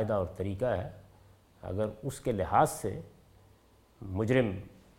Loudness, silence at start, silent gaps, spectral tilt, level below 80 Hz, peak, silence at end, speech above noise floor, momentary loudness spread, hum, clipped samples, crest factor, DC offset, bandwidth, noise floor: -32 LUFS; 0 s; none; -6.5 dB/octave; -56 dBFS; -10 dBFS; 0.25 s; 31 dB; 17 LU; none; under 0.1%; 22 dB; under 0.1%; 16.5 kHz; -62 dBFS